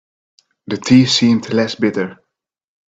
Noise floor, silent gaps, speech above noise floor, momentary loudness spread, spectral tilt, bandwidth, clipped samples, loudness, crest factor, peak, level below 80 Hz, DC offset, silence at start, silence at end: -73 dBFS; none; 59 dB; 14 LU; -5 dB/octave; 7.8 kHz; under 0.1%; -14 LUFS; 16 dB; 0 dBFS; -56 dBFS; under 0.1%; 0.7 s; 0.75 s